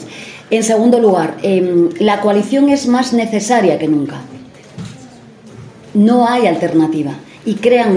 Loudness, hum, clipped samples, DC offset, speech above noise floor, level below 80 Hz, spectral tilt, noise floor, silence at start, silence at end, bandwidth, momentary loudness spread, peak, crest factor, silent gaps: -13 LUFS; none; under 0.1%; under 0.1%; 26 dB; -58 dBFS; -5.5 dB/octave; -38 dBFS; 0 s; 0 s; 10.5 kHz; 19 LU; 0 dBFS; 14 dB; none